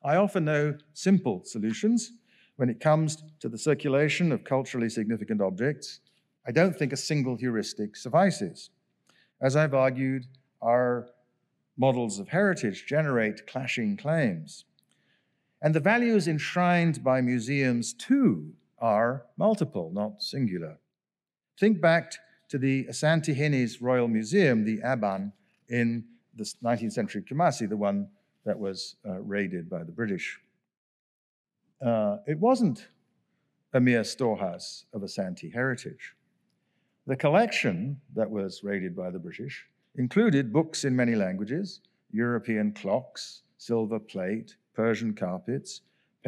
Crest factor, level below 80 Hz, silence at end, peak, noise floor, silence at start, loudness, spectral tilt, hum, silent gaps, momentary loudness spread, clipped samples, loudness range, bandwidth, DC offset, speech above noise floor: 18 dB; -80 dBFS; 0.5 s; -10 dBFS; under -90 dBFS; 0.05 s; -28 LUFS; -6 dB/octave; none; 30.77-31.45 s; 14 LU; under 0.1%; 5 LU; 12.5 kHz; under 0.1%; over 63 dB